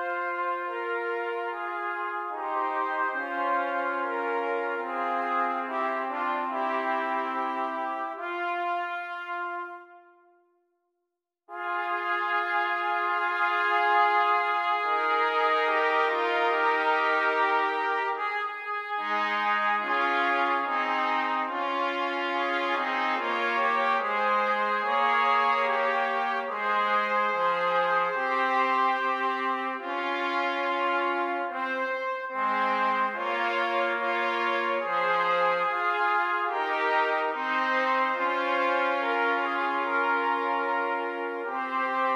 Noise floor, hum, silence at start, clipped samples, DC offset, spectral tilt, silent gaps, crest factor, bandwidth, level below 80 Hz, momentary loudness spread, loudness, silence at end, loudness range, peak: -84 dBFS; none; 0 s; under 0.1%; under 0.1%; -3.5 dB/octave; none; 16 dB; 13 kHz; -88 dBFS; 7 LU; -26 LUFS; 0 s; 6 LU; -12 dBFS